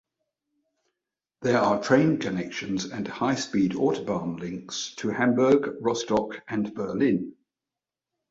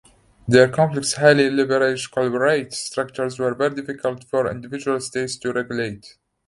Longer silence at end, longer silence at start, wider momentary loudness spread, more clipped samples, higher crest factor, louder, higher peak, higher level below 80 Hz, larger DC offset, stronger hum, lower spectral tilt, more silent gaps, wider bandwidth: first, 1 s vs 0.4 s; first, 1.4 s vs 0.45 s; about the same, 11 LU vs 11 LU; neither; about the same, 20 dB vs 20 dB; second, -26 LUFS vs -20 LUFS; second, -8 dBFS vs 0 dBFS; second, -62 dBFS vs -56 dBFS; neither; neither; about the same, -5.5 dB/octave vs -4.5 dB/octave; neither; second, 7.8 kHz vs 11.5 kHz